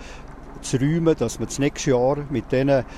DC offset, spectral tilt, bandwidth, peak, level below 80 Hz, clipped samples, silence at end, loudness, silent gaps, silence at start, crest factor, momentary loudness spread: under 0.1%; -6 dB/octave; 13.5 kHz; -8 dBFS; -40 dBFS; under 0.1%; 0 s; -22 LUFS; none; 0 s; 14 dB; 17 LU